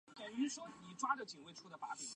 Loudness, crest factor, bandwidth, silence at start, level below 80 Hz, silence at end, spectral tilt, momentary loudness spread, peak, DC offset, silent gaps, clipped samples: -44 LUFS; 22 dB; 11.5 kHz; 0.05 s; -88 dBFS; 0 s; -2.5 dB/octave; 13 LU; -22 dBFS; under 0.1%; none; under 0.1%